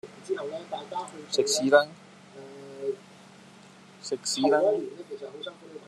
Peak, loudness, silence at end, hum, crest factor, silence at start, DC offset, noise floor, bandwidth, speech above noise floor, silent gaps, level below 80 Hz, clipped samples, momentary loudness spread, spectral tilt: -4 dBFS; -27 LUFS; 0.05 s; none; 24 dB; 0.05 s; under 0.1%; -52 dBFS; 13 kHz; 24 dB; none; -86 dBFS; under 0.1%; 21 LU; -2.5 dB/octave